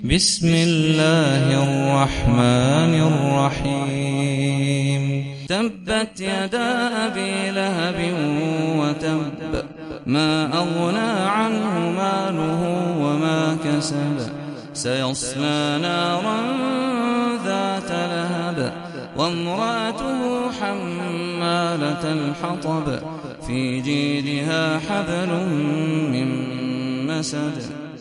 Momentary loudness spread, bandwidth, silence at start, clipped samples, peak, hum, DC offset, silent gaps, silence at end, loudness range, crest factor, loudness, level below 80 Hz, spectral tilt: 9 LU; 11.5 kHz; 0 s; under 0.1%; -2 dBFS; none; under 0.1%; none; 0 s; 5 LU; 20 dB; -21 LUFS; -44 dBFS; -5.5 dB/octave